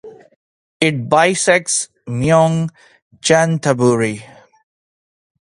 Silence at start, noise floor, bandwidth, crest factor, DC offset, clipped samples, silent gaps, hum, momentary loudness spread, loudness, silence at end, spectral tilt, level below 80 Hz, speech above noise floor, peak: 0.05 s; under -90 dBFS; 11.5 kHz; 18 dB; under 0.1%; under 0.1%; 0.36-0.80 s, 3.02-3.11 s; none; 9 LU; -15 LUFS; 1.3 s; -4.5 dB/octave; -52 dBFS; over 75 dB; 0 dBFS